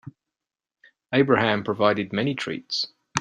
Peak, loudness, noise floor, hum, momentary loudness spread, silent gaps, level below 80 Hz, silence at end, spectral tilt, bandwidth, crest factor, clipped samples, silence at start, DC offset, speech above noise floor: -4 dBFS; -23 LUFS; -87 dBFS; none; 8 LU; none; -64 dBFS; 0 s; -5 dB/octave; 10 kHz; 22 dB; under 0.1%; 0.05 s; under 0.1%; 65 dB